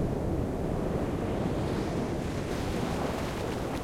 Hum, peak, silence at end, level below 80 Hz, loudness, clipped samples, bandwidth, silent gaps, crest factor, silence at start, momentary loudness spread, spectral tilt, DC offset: none; -18 dBFS; 0 s; -40 dBFS; -32 LUFS; under 0.1%; 16.5 kHz; none; 12 dB; 0 s; 2 LU; -6.5 dB/octave; under 0.1%